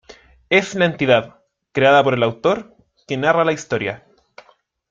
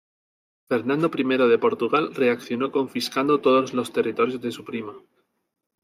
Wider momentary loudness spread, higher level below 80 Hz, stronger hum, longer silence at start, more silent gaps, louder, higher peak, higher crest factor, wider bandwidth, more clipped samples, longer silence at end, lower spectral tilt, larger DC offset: about the same, 13 LU vs 12 LU; first, -56 dBFS vs -74 dBFS; neither; second, 0.1 s vs 0.7 s; neither; first, -18 LUFS vs -23 LUFS; first, -2 dBFS vs -8 dBFS; about the same, 18 dB vs 16 dB; second, 7.6 kHz vs 15.5 kHz; neither; about the same, 0.95 s vs 0.85 s; about the same, -5 dB/octave vs -5.5 dB/octave; neither